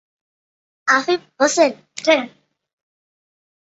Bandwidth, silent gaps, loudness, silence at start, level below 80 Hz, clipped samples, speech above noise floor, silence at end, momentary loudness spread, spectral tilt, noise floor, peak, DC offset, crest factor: 8.2 kHz; none; -18 LUFS; 0.85 s; -70 dBFS; under 0.1%; over 72 dB; 1.35 s; 8 LU; -1.5 dB/octave; under -90 dBFS; -2 dBFS; under 0.1%; 20 dB